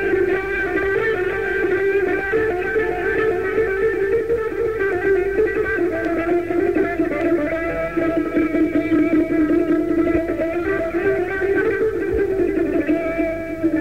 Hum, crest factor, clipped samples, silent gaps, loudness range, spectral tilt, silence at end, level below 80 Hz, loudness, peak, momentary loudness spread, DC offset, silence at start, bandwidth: none; 14 dB; under 0.1%; none; 1 LU; -7.5 dB/octave; 0 s; -40 dBFS; -20 LUFS; -6 dBFS; 3 LU; 0.7%; 0 s; 15.5 kHz